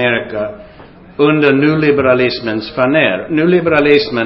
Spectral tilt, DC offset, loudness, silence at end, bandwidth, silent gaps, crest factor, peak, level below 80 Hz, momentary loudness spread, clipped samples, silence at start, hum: -8.5 dB/octave; under 0.1%; -12 LUFS; 0 s; 5.8 kHz; none; 12 dB; 0 dBFS; -46 dBFS; 10 LU; under 0.1%; 0 s; none